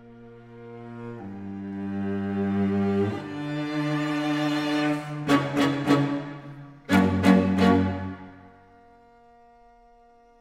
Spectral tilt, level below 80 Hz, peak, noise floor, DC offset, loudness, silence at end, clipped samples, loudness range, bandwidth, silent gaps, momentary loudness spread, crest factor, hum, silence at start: -7 dB/octave; -64 dBFS; -6 dBFS; -55 dBFS; under 0.1%; -25 LUFS; 1.9 s; under 0.1%; 6 LU; 14 kHz; none; 21 LU; 20 dB; none; 0 s